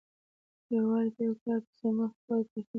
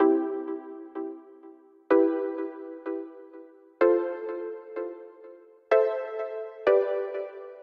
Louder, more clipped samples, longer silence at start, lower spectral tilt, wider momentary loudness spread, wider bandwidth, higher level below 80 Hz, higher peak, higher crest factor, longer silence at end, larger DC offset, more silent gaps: second, -32 LUFS vs -28 LUFS; neither; first, 0.7 s vs 0 s; first, -10.5 dB/octave vs -6.5 dB/octave; second, 5 LU vs 16 LU; second, 3 kHz vs 5.6 kHz; about the same, -76 dBFS vs -80 dBFS; second, -20 dBFS vs -10 dBFS; second, 12 dB vs 18 dB; about the same, 0 s vs 0 s; neither; first, 1.41-1.46 s, 1.67-1.73 s, 2.16-2.28 s, 2.50-2.56 s, 2.67-2.74 s vs none